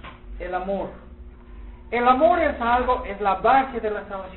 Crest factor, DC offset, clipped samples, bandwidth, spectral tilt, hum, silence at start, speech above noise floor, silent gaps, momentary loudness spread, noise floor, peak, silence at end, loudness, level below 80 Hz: 20 dB; 0.1%; under 0.1%; 4.2 kHz; -10 dB/octave; none; 0.05 s; 20 dB; none; 13 LU; -42 dBFS; -4 dBFS; 0 s; -22 LUFS; -40 dBFS